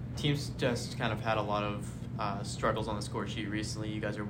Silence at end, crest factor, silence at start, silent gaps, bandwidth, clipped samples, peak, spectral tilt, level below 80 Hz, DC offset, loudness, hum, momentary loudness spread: 0 s; 18 dB; 0 s; none; 16 kHz; under 0.1%; -16 dBFS; -5.5 dB/octave; -52 dBFS; under 0.1%; -34 LUFS; none; 5 LU